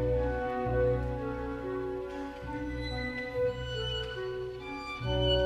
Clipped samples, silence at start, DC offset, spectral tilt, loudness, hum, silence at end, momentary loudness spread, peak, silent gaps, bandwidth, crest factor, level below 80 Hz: under 0.1%; 0 s; under 0.1%; -6.5 dB/octave; -34 LUFS; none; 0 s; 9 LU; -16 dBFS; none; 10.5 kHz; 16 dB; -42 dBFS